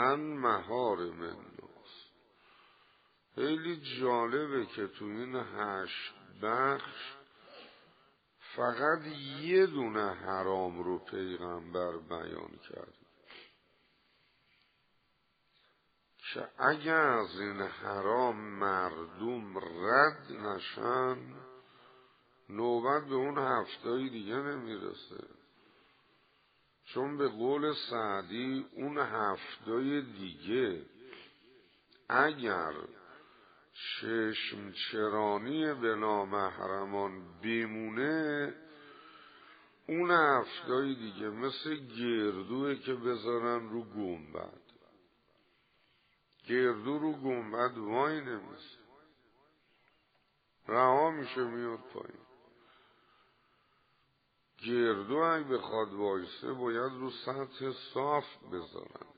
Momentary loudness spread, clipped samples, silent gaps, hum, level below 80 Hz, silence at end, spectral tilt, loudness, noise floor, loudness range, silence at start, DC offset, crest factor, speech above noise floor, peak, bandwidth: 19 LU; under 0.1%; none; none; -78 dBFS; 0.1 s; -3 dB/octave; -34 LUFS; -75 dBFS; 7 LU; 0 s; under 0.1%; 26 dB; 41 dB; -10 dBFS; 4.9 kHz